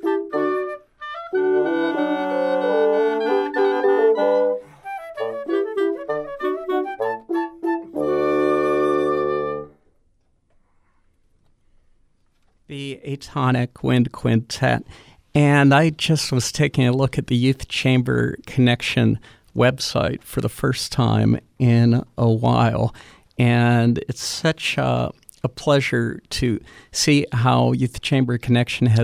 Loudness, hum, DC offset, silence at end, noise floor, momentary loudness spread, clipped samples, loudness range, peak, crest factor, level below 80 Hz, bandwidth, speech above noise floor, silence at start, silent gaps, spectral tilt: -20 LUFS; none; under 0.1%; 0 s; -62 dBFS; 11 LU; under 0.1%; 6 LU; -4 dBFS; 16 dB; -48 dBFS; 14.5 kHz; 44 dB; 0 s; none; -6 dB/octave